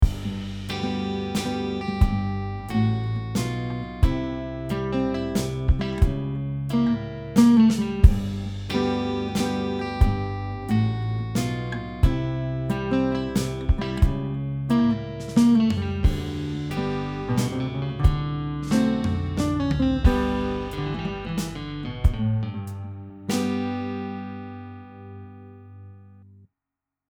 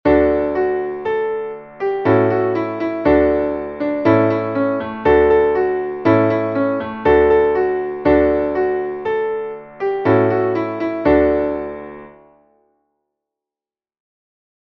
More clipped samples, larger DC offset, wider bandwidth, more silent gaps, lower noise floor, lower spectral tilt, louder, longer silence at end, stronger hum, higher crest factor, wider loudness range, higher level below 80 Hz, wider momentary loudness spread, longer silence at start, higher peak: neither; neither; first, 19 kHz vs 5.8 kHz; neither; about the same, -87 dBFS vs under -90 dBFS; second, -7 dB/octave vs -9.5 dB/octave; second, -25 LUFS vs -17 LUFS; second, 1 s vs 2.5 s; neither; first, 24 dB vs 16 dB; about the same, 7 LU vs 6 LU; first, -30 dBFS vs -38 dBFS; about the same, 11 LU vs 9 LU; about the same, 0 s vs 0.05 s; about the same, 0 dBFS vs -2 dBFS